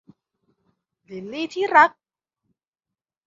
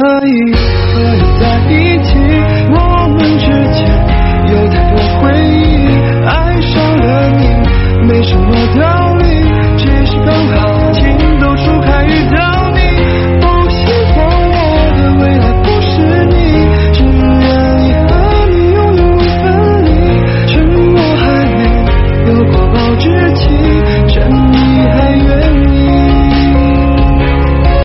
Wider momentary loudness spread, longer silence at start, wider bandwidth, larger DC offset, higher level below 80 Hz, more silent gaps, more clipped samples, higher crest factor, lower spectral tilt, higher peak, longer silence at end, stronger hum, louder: first, 22 LU vs 2 LU; first, 1.1 s vs 0 s; first, 7.6 kHz vs 6 kHz; neither; second, -74 dBFS vs -12 dBFS; neither; neither; first, 24 dB vs 8 dB; second, -4 dB/octave vs -10 dB/octave; about the same, -2 dBFS vs 0 dBFS; first, 1.4 s vs 0 s; neither; second, -19 LUFS vs -9 LUFS